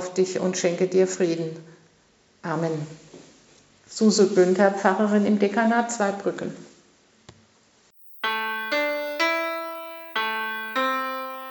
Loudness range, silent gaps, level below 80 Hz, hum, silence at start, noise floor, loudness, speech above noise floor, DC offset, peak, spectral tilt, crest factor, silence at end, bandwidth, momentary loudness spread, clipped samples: 7 LU; none; -74 dBFS; none; 0 s; -60 dBFS; -23 LUFS; 38 dB; under 0.1%; -4 dBFS; -4.5 dB/octave; 20 dB; 0 s; 19.5 kHz; 15 LU; under 0.1%